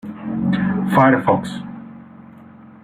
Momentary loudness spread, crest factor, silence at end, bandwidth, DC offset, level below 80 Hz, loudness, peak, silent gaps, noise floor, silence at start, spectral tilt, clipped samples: 21 LU; 18 dB; 0.65 s; 15 kHz; under 0.1%; -54 dBFS; -18 LUFS; -2 dBFS; none; -42 dBFS; 0.05 s; -8 dB/octave; under 0.1%